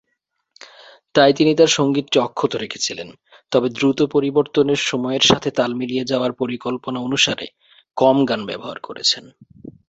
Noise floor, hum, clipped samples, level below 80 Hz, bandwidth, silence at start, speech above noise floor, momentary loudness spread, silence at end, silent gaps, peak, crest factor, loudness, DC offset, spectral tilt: -73 dBFS; none; under 0.1%; -56 dBFS; 8.2 kHz; 1.15 s; 55 dB; 11 LU; 0.2 s; none; 0 dBFS; 20 dB; -18 LUFS; under 0.1%; -4 dB/octave